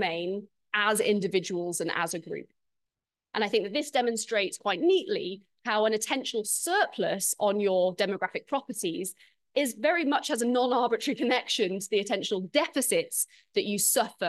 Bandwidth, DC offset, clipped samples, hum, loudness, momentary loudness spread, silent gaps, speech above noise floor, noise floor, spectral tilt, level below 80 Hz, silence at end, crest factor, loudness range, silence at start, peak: 12.5 kHz; under 0.1%; under 0.1%; none; -28 LUFS; 8 LU; none; 60 dB; -88 dBFS; -2.5 dB/octave; -80 dBFS; 0 s; 18 dB; 3 LU; 0 s; -10 dBFS